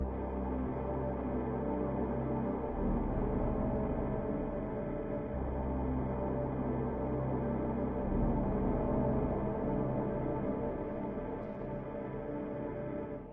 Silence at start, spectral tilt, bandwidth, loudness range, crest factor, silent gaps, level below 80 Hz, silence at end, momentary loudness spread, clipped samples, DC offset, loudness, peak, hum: 0 s; -10 dB/octave; 3.7 kHz; 3 LU; 14 dB; none; -42 dBFS; 0 s; 7 LU; under 0.1%; 0.1%; -36 LUFS; -20 dBFS; none